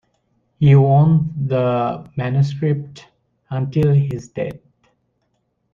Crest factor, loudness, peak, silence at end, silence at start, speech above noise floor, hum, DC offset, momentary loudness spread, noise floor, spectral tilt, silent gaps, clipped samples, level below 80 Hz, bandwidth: 16 dB; -18 LUFS; -2 dBFS; 1.15 s; 0.6 s; 52 dB; none; under 0.1%; 15 LU; -68 dBFS; -9.5 dB/octave; none; under 0.1%; -50 dBFS; 7.2 kHz